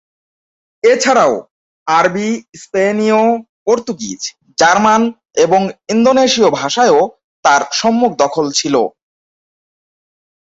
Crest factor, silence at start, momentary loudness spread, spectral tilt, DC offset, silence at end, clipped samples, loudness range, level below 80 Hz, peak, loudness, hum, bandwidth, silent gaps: 14 dB; 0.85 s; 11 LU; -3.5 dB/octave; under 0.1%; 1.55 s; under 0.1%; 4 LU; -58 dBFS; 0 dBFS; -13 LUFS; none; 8 kHz; 1.51-1.86 s, 2.49-2.53 s, 3.49-3.66 s, 7.24-7.43 s